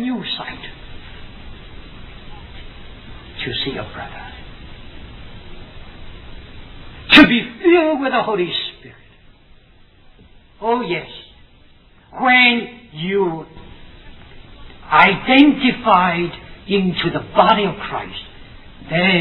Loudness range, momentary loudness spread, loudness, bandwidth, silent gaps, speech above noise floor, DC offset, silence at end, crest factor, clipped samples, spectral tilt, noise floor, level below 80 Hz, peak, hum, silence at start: 15 LU; 28 LU; -15 LUFS; 5.4 kHz; none; 31 dB; under 0.1%; 0 s; 20 dB; under 0.1%; -7 dB/octave; -48 dBFS; -40 dBFS; 0 dBFS; none; 0 s